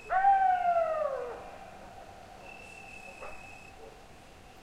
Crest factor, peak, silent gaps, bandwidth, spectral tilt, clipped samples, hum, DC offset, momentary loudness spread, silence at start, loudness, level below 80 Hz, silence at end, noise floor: 18 dB; -16 dBFS; none; 12 kHz; -4 dB/octave; under 0.1%; none; under 0.1%; 24 LU; 0 s; -28 LUFS; -58 dBFS; 0 s; -52 dBFS